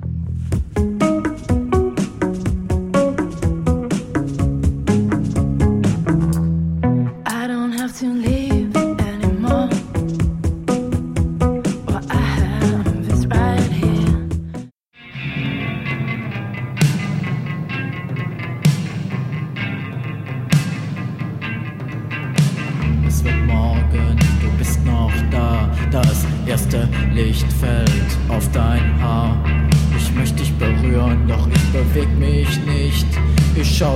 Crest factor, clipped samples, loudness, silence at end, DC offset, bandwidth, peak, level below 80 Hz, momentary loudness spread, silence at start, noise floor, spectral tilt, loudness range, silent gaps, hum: 16 dB; under 0.1%; -19 LUFS; 0 s; under 0.1%; 15.5 kHz; -2 dBFS; -22 dBFS; 9 LU; 0 s; -42 dBFS; -6.5 dB/octave; 5 LU; none; none